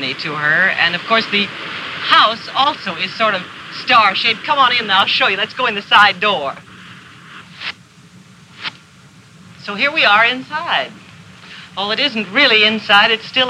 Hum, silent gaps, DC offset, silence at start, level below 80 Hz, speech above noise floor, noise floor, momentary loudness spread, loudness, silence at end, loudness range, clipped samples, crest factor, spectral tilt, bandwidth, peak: none; none; under 0.1%; 0 s; -64 dBFS; 29 dB; -44 dBFS; 17 LU; -13 LUFS; 0 s; 8 LU; under 0.1%; 16 dB; -3.5 dB/octave; 14 kHz; 0 dBFS